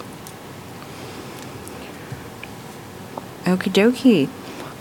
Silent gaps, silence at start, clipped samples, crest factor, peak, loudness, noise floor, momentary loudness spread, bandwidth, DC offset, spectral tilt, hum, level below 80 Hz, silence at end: none; 0 s; under 0.1%; 20 dB; -2 dBFS; -18 LUFS; -37 dBFS; 20 LU; 18 kHz; under 0.1%; -5.5 dB/octave; none; -56 dBFS; 0 s